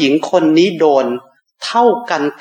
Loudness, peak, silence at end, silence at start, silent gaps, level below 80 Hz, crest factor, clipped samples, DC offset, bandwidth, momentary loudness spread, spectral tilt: -13 LUFS; 0 dBFS; 0.1 s; 0 s; none; -68 dBFS; 14 dB; under 0.1%; under 0.1%; 9.6 kHz; 10 LU; -5 dB/octave